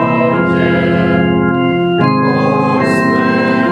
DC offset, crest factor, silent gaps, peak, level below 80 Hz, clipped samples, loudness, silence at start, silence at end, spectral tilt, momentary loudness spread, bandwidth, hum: under 0.1%; 12 dB; none; 0 dBFS; -44 dBFS; under 0.1%; -12 LUFS; 0 s; 0 s; -7.5 dB/octave; 1 LU; 11.5 kHz; none